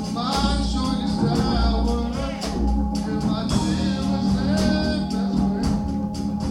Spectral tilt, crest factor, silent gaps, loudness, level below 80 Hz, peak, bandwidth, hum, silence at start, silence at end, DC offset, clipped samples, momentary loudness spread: -6 dB/octave; 14 dB; none; -23 LUFS; -28 dBFS; -6 dBFS; 13 kHz; none; 0 s; 0 s; under 0.1%; under 0.1%; 5 LU